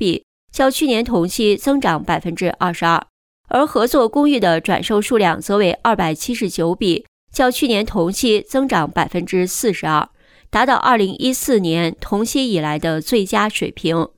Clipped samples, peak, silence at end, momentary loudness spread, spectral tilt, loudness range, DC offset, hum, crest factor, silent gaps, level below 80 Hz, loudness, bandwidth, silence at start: under 0.1%; -2 dBFS; 0.1 s; 6 LU; -4.5 dB/octave; 2 LU; under 0.1%; none; 14 dB; 0.23-0.48 s, 3.10-3.44 s, 7.08-7.27 s; -42 dBFS; -17 LUFS; over 20 kHz; 0 s